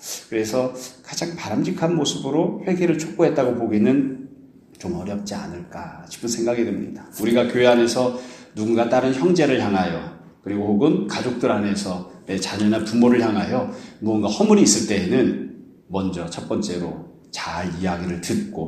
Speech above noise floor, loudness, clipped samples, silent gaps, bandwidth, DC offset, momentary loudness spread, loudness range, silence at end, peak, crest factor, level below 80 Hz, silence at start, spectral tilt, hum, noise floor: 26 dB; -21 LUFS; under 0.1%; none; 15 kHz; under 0.1%; 15 LU; 6 LU; 0 s; -2 dBFS; 18 dB; -56 dBFS; 0 s; -5 dB/octave; none; -47 dBFS